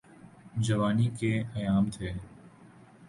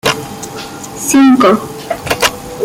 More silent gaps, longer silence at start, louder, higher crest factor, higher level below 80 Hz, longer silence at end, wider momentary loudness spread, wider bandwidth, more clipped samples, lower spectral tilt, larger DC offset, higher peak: neither; first, 0.25 s vs 0.05 s; second, -30 LUFS vs -12 LUFS; about the same, 16 dB vs 12 dB; second, -52 dBFS vs -42 dBFS; about the same, 0 s vs 0 s; second, 13 LU vs 17 LU; second, 11.5 kHz vs 17 kHz; neither; first, -7 dB/octave vs -3.5 dB/octave; neither; second, -14 dBFS vs 0 dBFS